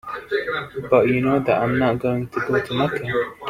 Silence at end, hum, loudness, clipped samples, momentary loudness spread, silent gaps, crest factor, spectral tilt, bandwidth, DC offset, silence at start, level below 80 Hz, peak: 0 s; none; -21 LUFS; under 0.1%; 7 LU; none; 18 dB; -7.5 dB/octave; 15.5 kHz; under 0.1%; 0.05 s; -52 dBFS; -2 dBFS